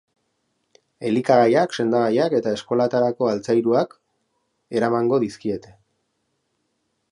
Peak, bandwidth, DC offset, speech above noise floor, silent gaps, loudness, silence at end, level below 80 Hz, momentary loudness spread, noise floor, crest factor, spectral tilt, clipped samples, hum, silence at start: -2 dBFS; 11 kHz; under 0.1%; 53 dB; none; -21 LUFS; 1.5 s; -66 dBFS; 12 LU; -73 dBFS; 20 dB; -6.5 dB/octave; under 0.1%; none; 1 s